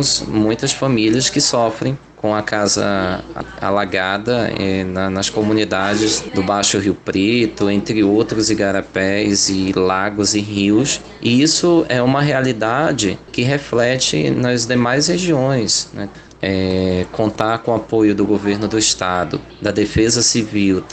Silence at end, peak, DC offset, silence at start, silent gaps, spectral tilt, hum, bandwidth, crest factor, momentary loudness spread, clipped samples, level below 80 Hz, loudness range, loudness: 0 s; 0 dBFS; under 0.1%; 0 s; none; -4 dB/octave; none; 9.4 kHz; 16 dB; 6 LU; under 0.1%; -44 dBFS; 3 LU; -16 LUFS